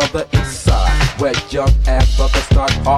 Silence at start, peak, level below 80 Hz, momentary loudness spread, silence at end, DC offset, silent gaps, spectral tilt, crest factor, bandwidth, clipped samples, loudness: 0 s; 0 dBFS; -16 dBFS; 3 LU; 0 s; under 0.1%; none; -5 dB/octave; 14 dB; 13 kHz; under 0.1%; -15 LUFS